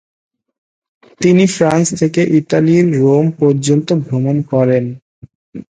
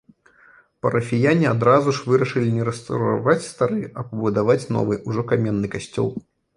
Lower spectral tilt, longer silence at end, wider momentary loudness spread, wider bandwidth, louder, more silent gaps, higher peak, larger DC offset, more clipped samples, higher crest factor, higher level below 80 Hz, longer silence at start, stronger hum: about the same, -6.5 dB/octave vs -7 dB/octave; second, 0.15 s vs 0.35 s; second, 6 LU vs 9 LU; second, 9.6 kHz vs 11 kHz; first, -13 LUFS vs -21 LUFS; first, 5.02-5.22 s, 5.35-5.52 s vs none; about the same, 0 dBFS vs -2 dBFS; neither; neither; about the same, 14 dB vs 18 dB; about the same, -54 dBFS vs -54 dBFS; first, 1.2 s vs 0.85 s; neither